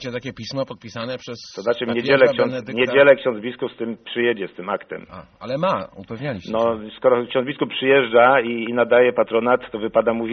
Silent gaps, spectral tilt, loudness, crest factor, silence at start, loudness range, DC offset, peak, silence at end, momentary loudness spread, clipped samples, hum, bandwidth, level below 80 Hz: none; -3 dB/octave; -20 LUFS; 20 dB; 0 s; 7 LU; under 0.1%; 0 dBFS; 0 s; 15 LU; under 0.1%; none; 6.6 kHz; -60 dBFS